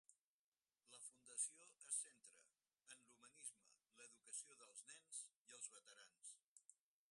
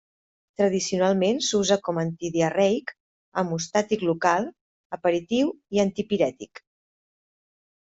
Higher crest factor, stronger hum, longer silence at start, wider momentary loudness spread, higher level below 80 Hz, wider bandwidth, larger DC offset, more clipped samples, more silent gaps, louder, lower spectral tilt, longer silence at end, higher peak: first, 26 dB vs 20 dB; neither; second, 0.1 s vs 0.6 s; first, 19 LU vs 11 LU; second, under -90 dBFS vs -64 dBFS; first, 11.5 kHz vs 8 kHz; neither; neither; second, 0.21-0.52 s, 5.36-5.45 s, 6.46-6.56 s vs 3.00-3.32 s, 4.61-4.90 s; second, -53 LUFS vs -24 LUFS; second, 2 dB/octave vs -4.5 dB/octave; second, 0.35 s vs 1.35 s; second, -32 dBFS vs -6 dBFS